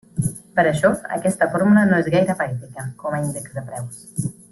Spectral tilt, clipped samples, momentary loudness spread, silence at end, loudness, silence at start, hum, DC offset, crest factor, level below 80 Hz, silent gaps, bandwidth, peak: -6.5 dB/octave; under 0.1%; 15 LU; 0.2 s; -20 LUFS; 0.15 s; none; under 0.1%; 18 dB; -52 dBFS; none; 12.5 kHz; -4 dBFS